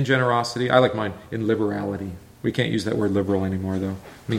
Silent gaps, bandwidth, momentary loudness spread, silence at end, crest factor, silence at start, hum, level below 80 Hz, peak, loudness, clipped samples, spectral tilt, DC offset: none; 16 kHz; 11 LU; 0 s; 20 dB; 0 s; none; -54 dBFS; -4 dBFS; -23 LUFS; under 0.1%; -6.5 dB/octave; under 0.1%